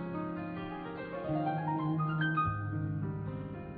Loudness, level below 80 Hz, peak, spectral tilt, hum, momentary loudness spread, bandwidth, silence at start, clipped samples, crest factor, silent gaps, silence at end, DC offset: -35 LUFS; -58 dBFS; -20 dBFS; -6.5 dB/octave; none; 9 LU; 4.6 kHz; 0 s; under 0.1%; 14 dB; none; 0 s; under 0.1%